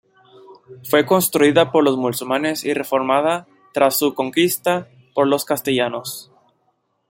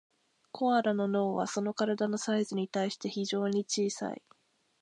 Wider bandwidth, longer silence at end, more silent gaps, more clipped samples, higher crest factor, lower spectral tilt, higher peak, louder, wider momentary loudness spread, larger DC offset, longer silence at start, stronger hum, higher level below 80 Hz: first, 17 kHz vs 11 kHz; first, 0.85 s vs 0.65 s; neither; neither; about the same, 18 dB vs 18 dB; about the same, -4 dB/octave vs -4.5 dB/octave; first, -2 dBFS vs -14 dBFS; first, -18 LUFS vs -31 LUFS; first, 12 LU vs 7 LU; neither; about the same, 0.5 s vs 0.55 s; neither; first, -64 dBFS vs -82 dBFS